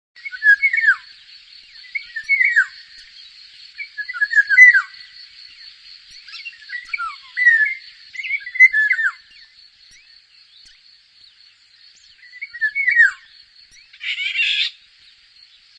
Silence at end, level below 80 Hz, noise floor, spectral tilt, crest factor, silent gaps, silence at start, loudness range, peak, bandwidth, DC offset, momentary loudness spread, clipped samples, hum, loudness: 1.1 s; -68 dBFS; -51 dBFS; 4.5 dB/octave; 20 dB; none; 0.25 s; 6 LU; 0 dBFS; 10.5 kHz; under 0.1%; 22 LU; under 0.1%; none; -15 LUFS